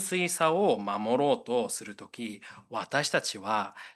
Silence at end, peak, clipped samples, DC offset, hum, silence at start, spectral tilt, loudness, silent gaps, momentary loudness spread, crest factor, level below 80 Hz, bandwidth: 0.05 s; -10 dBFS; under 0.1%; under 0.1%; none; 0 s; -3.5 dB/octave; -29 LUFS; none; 14 LU; 20 dB; -78 dBFS; 12.5 kHz